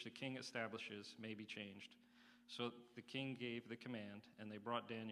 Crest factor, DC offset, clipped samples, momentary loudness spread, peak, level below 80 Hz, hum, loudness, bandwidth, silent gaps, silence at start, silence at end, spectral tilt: 22 dB; under 0.1%; under 0.1%; 13 LU; -28 dBFS; under -90 dBFS; none; -50 LUFS; 14 kHz; none; 0 s; 0 s; -5 dB/octave